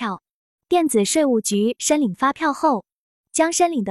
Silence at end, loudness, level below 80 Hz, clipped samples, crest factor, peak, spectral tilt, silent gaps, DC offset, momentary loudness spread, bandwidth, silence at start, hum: 0 s; -20 LUFS; -64 dBFS; under 0.1%; 14 dB; -6 dBFS; -3.5 dB/octave; 0.31-0.58 s, 2.92-3.24 s; under 0.1%; 8 LU; 13.5 kHz; 0 s; none